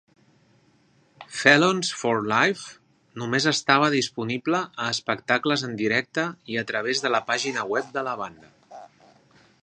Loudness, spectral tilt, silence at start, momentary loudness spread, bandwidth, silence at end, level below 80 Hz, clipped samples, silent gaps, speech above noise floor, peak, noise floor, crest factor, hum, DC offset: -23 LUFS; -3.5 dB/octave; 1.2 s; 12 LU; 11 kHz; 0.8 s; -70 dBFS; under 0.1%; none; 37 dB; 0 dBFS; -61 dBFS; 24 dB; none; under 0.1%